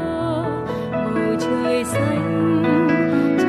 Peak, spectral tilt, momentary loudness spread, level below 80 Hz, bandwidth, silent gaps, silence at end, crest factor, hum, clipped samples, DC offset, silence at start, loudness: -6 dBFS; -6.5 dB/octave; 6 LU; -48 dBFS; 13 kHz; none; 0 s; 12 dB; none; under 0.1%; under 0.1%; 0 s; -20 LUFS